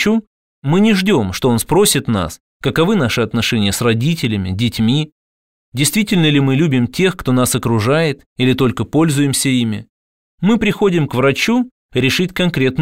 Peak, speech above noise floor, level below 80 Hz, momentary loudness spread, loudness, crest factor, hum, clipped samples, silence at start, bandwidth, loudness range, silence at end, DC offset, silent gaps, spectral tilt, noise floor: -2 dBFS; over 76 dB; -42 dBFS; 7 LU; -15 LUFS; 14 dB; none; under 0.1%; 0 s; 16.5 kHz; 2 LU; 0 s; 0.5%; 0.27-0.62 s, 2.40-2.60 s, 5.12-5.72 s, 8.26-8.36 s, 9.89-10.38 s, 11.71-11.89 s; -5 dB/octave; under -90 dBFS